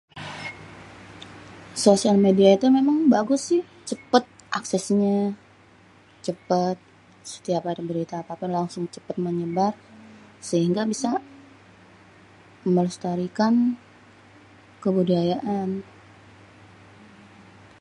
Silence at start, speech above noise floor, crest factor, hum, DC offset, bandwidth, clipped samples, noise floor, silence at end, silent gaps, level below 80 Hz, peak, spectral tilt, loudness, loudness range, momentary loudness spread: 0.15 s; 31 dB; 22 dB; none; under 0.1%; 11.5 kHz; under 0.1%; -53 dBFS; 2 s; none; -66 dBFS; -2 dBFS; -6 dB/octave; -23 LUFS; 8 LU; 21 LU